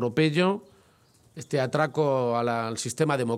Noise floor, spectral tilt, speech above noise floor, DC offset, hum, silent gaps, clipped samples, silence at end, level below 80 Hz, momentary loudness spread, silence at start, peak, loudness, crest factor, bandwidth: -60 dBFS; -5.5 dB/octave; 35 dB; under 0.1%; none; none; under 0.1%; 0 s; -70 dBFS; 8 LU; 0 s; -10 dBFS; -26 LUFS; 18 dB; 14.5 kHz